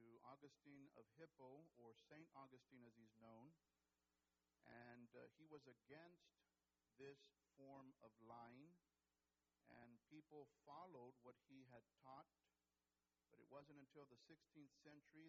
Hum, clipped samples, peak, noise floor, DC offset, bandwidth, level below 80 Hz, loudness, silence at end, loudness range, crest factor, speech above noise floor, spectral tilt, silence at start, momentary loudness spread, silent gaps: none; under 0.1%; -48 dBFS; under -90 dBFS; under 0.1%; 7.2 kHz; under -90 dBFS; -67 LUFS; 0 s; 2 LU; 20 dB; over 23 dB; -5 dB/octave; 0 s; 5 LU; none